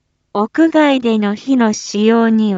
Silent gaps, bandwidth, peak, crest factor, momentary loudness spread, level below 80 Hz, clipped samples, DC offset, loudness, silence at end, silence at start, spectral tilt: none; 7.8 kHz; -2 dBFS; 12 dB; 7 LU; -62 dBFS; under 0.1%; under 0.1%; -14 LUFS; 0 s; 0.35 s; -5.5 dB/octave